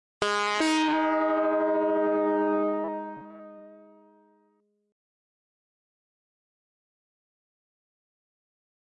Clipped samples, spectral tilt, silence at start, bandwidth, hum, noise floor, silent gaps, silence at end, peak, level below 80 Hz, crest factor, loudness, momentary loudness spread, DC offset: under 0.1%; -3.5 dB/octave; 0.2 s; 11.5 kHz; none; -70 dBFS; none; 5.2 s; -10 dBFS; -74 dBFS; 20 dB; -26 LUFS; 18 LU; under 0.1%